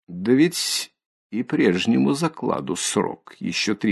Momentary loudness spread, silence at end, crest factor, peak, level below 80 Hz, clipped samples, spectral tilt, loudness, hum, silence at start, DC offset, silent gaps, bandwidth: 11 LU; 0 s; 16 dB; -6 dBFS; -60 dBFS; under 0.1%; -4 dB/octave; -22 LUFS; none; 0.1 s; under 0.1%; 1.06-1.30 s; 12.5 kHz